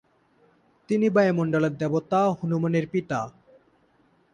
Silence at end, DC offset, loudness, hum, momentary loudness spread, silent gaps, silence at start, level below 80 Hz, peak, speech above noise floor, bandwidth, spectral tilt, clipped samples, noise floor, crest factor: 1.05 s; under 0.1%; -24 LUFS; none; 8 LU; none; 0.9 s; -66 dBFS; -10 dBFS; 40 dB; 10 kHz; -8 dB/octave; under 0.1%; -63 dBFS; 16 dB